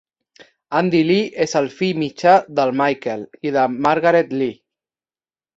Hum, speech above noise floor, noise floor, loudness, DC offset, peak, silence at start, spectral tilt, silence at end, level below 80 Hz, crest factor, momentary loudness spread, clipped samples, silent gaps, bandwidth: none; over 73 dB; under -90 dBFS; -18 LUFS; under 0.1%; -2 dBFS; 0.7 s; -5.5 dB/octave; 1.05 s; -62 dBFS; 18 dB; 9 LU; under 0.1%; none; 8 kHz